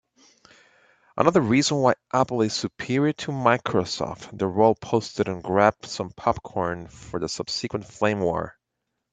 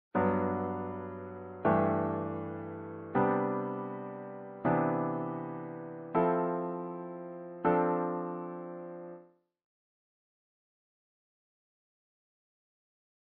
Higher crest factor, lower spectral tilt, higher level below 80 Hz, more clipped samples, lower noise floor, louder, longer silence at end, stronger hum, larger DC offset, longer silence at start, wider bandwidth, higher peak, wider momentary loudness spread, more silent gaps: about the same, 22 dB vs 22 dB; second, -5 dB/octave vs -8.5 dB/octave; first, -56 dBFS vs -70 dBFS; neither; first, -80 dBFS vs -57 dBFS; first, -24 LUFS vs -33 LUFS; second, 0.65 s vs 3.95 s; neither; neither; first, 1.15 s vs 0.15 s; first, 9.4 kHz vs 4.2 kHz; first, -2 dBFS vs -14 dBFS; second, 11 LU vs 14 LU; neither